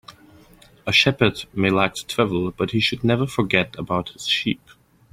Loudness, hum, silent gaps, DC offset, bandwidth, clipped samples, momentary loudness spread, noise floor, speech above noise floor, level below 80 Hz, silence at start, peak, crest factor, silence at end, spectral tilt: -21 LUFS; none; none; under 0.1%; 16 kHz; under 0.1%; 9 LU; -50 dBFS; 29 dB; -50 dBFS; 0.1 s; 0 dBFS; 22 dB; 0.55 s; -5 dB/octave